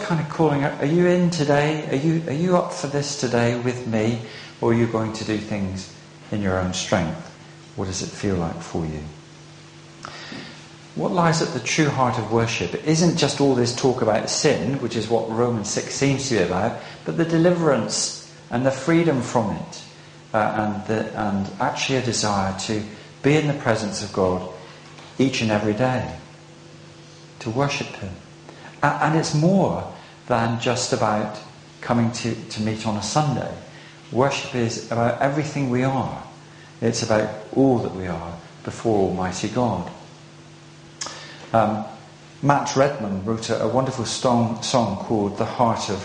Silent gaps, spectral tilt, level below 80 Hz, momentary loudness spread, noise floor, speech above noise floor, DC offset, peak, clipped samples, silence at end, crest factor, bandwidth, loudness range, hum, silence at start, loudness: none; -5 dB/octave; -52 dBFS; 17 LU; -44 dBFS; 23 dB; under 0.1%; 0 dBFS; under 0.1%; 0 s; 22 dB; 10 kHz; 6 LU; none; 0 s; -22 LUFS